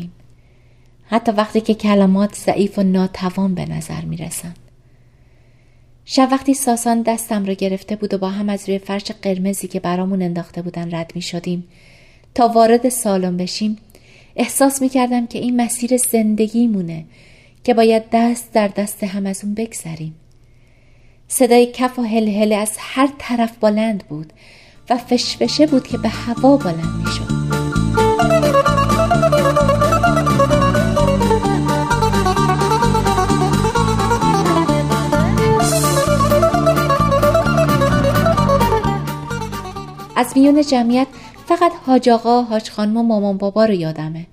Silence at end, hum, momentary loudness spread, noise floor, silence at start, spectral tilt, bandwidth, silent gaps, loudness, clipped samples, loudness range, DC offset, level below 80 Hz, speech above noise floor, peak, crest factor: 0.05 s; none; 11 LU; -48 dBFS; 0 s; -5.5 dB/octave; 15.5 kHz; none; -16 LUFS; under 0.1%; 7 LU; under 0.1%; -34 dBFS; 32 dB; -2 dBFS; 16 dB